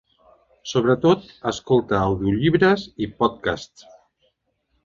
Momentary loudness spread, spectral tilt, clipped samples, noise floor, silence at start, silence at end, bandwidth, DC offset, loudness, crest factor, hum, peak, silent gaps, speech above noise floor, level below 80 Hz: 12 LU; -6.5 dB/octave; under 0.1%; -70 dBFS; 0.65 s; 1.2 s; 7.6 kHz; under 0.1%; -21 LUFS; 18 dB; none; -4 dBFS; none; 50 dB; -46 dBFS